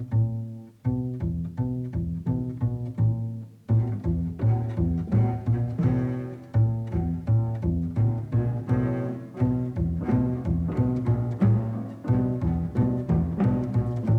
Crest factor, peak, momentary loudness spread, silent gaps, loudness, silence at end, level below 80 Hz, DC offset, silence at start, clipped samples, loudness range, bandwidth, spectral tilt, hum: 14 dB; -10 dBFS; 6 LU; none; -26 LUFS; 0 s; -40 dBFS; under 0.1%; 0 s; under 0.1%; 3 LU; 3.1 kHz; -11 dB/octave; none